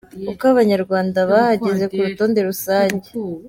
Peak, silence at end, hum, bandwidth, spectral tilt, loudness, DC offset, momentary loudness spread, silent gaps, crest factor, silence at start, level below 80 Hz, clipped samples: -4 dBFS; 0 s; none; 17 kHz; -6 dB/octave; -17 LUFS; under 0.1%; 6 LU; none; 14 dB; 0.15 s; -56 dBFS; under 0.1%